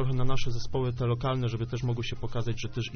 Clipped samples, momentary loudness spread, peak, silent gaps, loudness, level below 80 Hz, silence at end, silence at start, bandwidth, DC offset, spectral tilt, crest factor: under 0.1%; 5 LU; -12 dBFS; none; -31 LUFS; -38 dBFS; 0 s; 0 s; 6.6 kHz; under 0.1%; -6 dB/octave; 14 dB